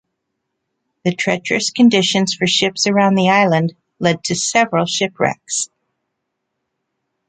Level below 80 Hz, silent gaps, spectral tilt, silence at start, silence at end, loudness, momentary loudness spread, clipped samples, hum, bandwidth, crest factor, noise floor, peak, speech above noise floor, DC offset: -60 dBFS; none; -4 dB/octave; 1.05 s; 1.65 s; -16 LUFS; 9 LU; under 0.1%; none; 9.4 kHz; 16 dB; -75 dBFS; -2 dBFS; 59 dB; under 0.1%